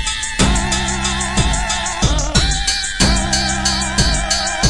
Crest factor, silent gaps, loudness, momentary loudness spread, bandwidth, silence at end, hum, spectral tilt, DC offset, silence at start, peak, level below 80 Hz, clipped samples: 16 dB; none; -16 LUFS; 3 LU; 11.5 kHz; 0 s; none; -2.5 dB/octave; under 0.1%; 0 s; 0 dBFS; -22 dBFS; under 0.1%